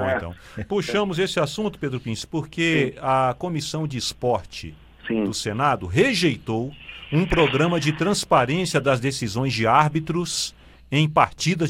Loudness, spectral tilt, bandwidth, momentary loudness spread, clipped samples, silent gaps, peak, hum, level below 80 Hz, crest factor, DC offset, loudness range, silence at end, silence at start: -22 LUFS; -5 dB/octave; 16 kHz; 10 LU; under 0.1%; none; -2 dBFS; none; -44 dBFS; 20 dB; under 0.1%; 4 LU; 0 s; 0 s